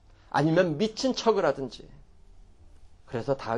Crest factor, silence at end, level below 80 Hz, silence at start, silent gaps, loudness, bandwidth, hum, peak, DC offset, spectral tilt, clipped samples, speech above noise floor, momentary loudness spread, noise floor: 18 dB; 0 s; -54 dBFS; 0.35 s; none; -27 LUFS; 10.5 kHz; none; -10 dBFS; under 0.1%; -5.5 dB/octave; under 0.1%; 25 dB; 13 LU; -51 dBFS